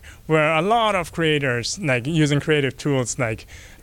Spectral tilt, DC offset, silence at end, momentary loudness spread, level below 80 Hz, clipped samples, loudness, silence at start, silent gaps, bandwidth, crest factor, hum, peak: -5 dB/octave; under 0.1%; 0.05 s; 6 LU; -48 dBFS; under 0.1%; -20 LUFS; 0.05 s; none; 16.5 kHz; 16 dB; none; -6 dBFS